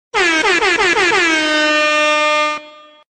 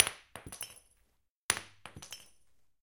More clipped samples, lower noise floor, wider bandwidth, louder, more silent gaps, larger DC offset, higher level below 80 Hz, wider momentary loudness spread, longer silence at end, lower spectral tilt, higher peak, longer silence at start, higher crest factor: neither; second, -39 dBFS vs -75 dBFS; second, 12.5 kHz vs 17 kHz; first, -13 LUFS vs -37 LUFS; second, none vs 1.30-1.49 s; neither; first, -50 dBFS vs -68 dBFS; second, 3 LU vs 17 LU; second, 0.45 s vs 0.6 s; about the same, -1 dB/octave vs -0.5 dB/octave; second, -4 dBFS vs 0 dBFS; first, 0.15 s vs 0 s; second, 12 dB vs 38 dB